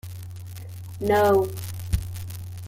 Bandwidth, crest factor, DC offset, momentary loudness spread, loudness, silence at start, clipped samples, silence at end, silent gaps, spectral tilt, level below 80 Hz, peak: 16.5 kHz; 16 dB; under 0.1%; 19 LU; -24 LUFS; 0.05 s; under 0.1%; 0 s; none; -6 dB/octave; -40 dBFS; -8 dBFS